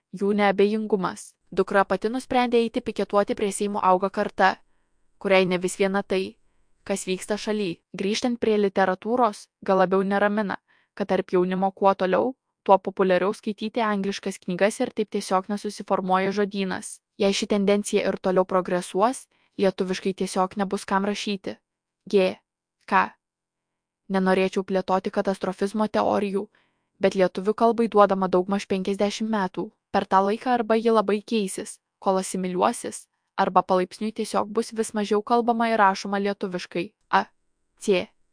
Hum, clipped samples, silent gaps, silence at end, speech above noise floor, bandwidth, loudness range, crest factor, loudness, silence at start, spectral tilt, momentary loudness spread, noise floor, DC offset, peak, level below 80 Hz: none; under 0.1%; none; 0.3 s; 62 dB; 10.5 kHz; 3 LU; 22 dB; -24 LUFS; 0.15 s; -5 dB/octave; 10 LU; -86 dBFS; under 0.1%; -2 dBFS; -62 dBFS